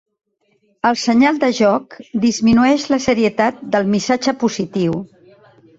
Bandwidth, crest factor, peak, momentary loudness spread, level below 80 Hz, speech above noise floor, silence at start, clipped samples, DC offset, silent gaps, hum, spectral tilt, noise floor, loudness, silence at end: 7.8 kHz; 14 dB; -2 dBFS; 7 LU; -50 dBFS; 46 dB; 0.85 s; under 0.1%; under 0.1%; none; none; -5 dB/octave; -62 dBFS; -16 LUFS; 0.75 s